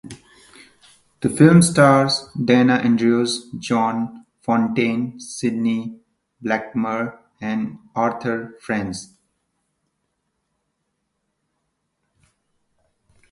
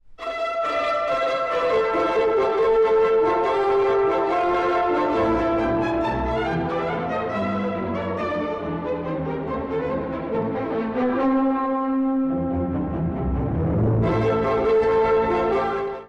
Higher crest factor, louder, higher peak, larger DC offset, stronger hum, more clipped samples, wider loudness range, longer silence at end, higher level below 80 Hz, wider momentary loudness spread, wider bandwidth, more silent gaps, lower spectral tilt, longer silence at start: first, 20 dB vs 8 dB; first, -19 LUFS vs -22 LUFS; first, 0 dBFS vs -12 dBFS; neither; neither; neither; first, 12 LU vs 6 LU; first, 4.25 s vs 0 s; second, -58 dBFS vs -40 dBFS; first, 16 LU vs 7 LU; first, 11.5 kHz vs 8.4 kHz; neither; second, -5.5 dB/octave vs -8 dB/octave; about the same, 0.05 s vs 0.05 s